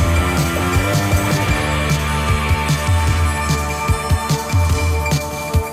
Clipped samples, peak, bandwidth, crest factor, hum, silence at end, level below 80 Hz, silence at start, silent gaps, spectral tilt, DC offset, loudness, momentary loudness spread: under 0.1%; -6 dBFS; 16 kHz; 12 dB; none; 0 s; -24 dBFS; 0 s; none; -5 dB/octave; under 0.1%; -17 LUFS; 3 LU